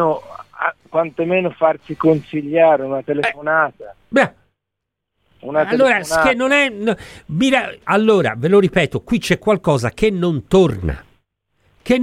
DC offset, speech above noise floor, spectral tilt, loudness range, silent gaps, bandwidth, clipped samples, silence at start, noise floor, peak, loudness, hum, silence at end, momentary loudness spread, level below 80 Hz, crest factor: under 0.1%; 63 dB; -6 dB/octave; 3 LU; none; 15.5 kHz; under 0.1%; 0 s; -80 dBFS; -2 dBFS; -17 LUFS; none; 0 s; 9 LU; -42 dBFS; 16 dB